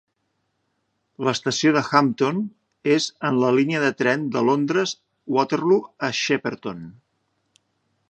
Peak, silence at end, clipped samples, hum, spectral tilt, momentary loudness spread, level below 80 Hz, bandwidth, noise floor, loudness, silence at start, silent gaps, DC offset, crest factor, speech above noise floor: 0 dBFS; 1.2 s; under 0.1%; none; -5 dB/octave; 10 LU; -68 dBFS; 8.8 kHz; -73 dBFS; -21 LUFS; 1.2 s; none; under 0.1%; 22 dB; 52 dB